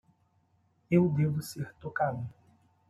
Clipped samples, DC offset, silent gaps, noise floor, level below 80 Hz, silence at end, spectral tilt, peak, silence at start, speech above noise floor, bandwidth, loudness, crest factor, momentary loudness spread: under 0.1%; under 0.1%; none; -70 dBFS; -68 dBFS; 0.6 s; -7.5 dB/octave; -12 dBFS; 0.9 s; 41 dB; 13.5 kHz; -30 LUFS; 20 dB; 14 LU